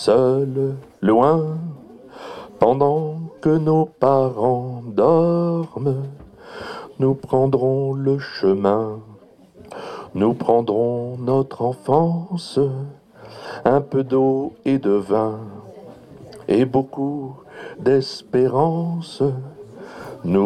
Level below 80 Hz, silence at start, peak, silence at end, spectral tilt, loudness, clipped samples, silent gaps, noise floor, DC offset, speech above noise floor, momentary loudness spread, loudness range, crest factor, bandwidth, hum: -56 dBFS; 0 s; -2 dBFS; 0 s; -8.5 dB/octave; -20 LUFS; under 0.1%; none; -46 dBFS; under 0.1%; 28 dB; 19 LU; 3 LU; 18 dB; 9.6 kHz; none